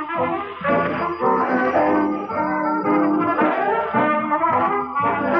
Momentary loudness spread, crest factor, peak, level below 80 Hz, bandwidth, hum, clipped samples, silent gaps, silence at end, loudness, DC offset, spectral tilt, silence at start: 4 LU; 12 dB; -6 dBFS; -60 dBFS; 6 kHz; none; under 0.1%; none; 0 s; -20 LUFS; under 0.1%; -8.5 dB/octave; 0 s